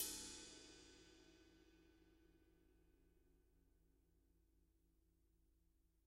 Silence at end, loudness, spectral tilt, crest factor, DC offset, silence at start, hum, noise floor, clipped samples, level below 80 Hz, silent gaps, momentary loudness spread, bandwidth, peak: 0.05 s; -54 LUFS; -1 dB/octave; 30 dB; under 0.1%; 0 s; none; -80 dBFS; under 0.1%; -76 dBFS; none; 19 LU; 14 kHz; -32 dBFS